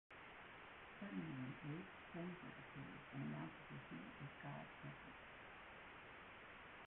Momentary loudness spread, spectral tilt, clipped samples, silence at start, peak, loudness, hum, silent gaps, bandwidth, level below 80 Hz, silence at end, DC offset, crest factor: 8 LU; -5 dB/octave; under 0.1%; 0.1 s; -38 dBFS; -55 LUFS; none; none; 4 kHz; -76 dBFS; 0 s; under 0.1%; 16 dB